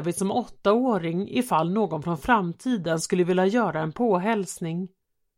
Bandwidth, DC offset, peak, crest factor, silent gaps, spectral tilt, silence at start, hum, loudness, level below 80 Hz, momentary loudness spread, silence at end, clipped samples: 16.5 kHz; under 0.1%; -6 dBFS; 18 dB; none; -5.5 dB/octave; 0 s; none; -25 LUFS; -56 dBFS; 7 LU; 0.5 s; under 0.1%